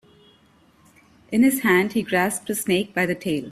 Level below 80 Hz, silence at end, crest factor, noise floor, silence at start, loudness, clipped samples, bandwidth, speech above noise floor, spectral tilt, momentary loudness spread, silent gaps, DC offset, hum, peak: -60 dBFS; 0 s; 18 dB; -57 dBFS; 1.3 s; -21 LUFS; under 0.1%; 16 kHz; 36 dB; -4.5 dB/octave; 7 LU; none; under 0.1%; none; -6 dBFS